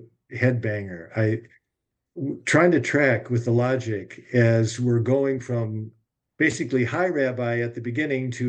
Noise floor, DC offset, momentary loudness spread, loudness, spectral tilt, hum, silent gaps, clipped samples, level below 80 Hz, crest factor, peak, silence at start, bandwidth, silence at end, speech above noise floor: -82 dBFS; under 0.1%; 12 LU; -23 LUFS; -6.5 dB/octave; none; none; under 0.1%; -66 dBFS; 18 dB; -4 dBFS; 0 s; 9.2 kHz; 0 s; 59 dB